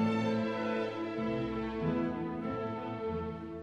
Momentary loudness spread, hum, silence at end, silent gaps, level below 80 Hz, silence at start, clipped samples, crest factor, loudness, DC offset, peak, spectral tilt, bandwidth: 5 LU; none; 0 s; none; -54 dBFS; 0 s; under 0.1%; 14 dB; -35 LUFS; under 0.1%; -20 dBFS; -7.5 dB/octave; 7.6 kHz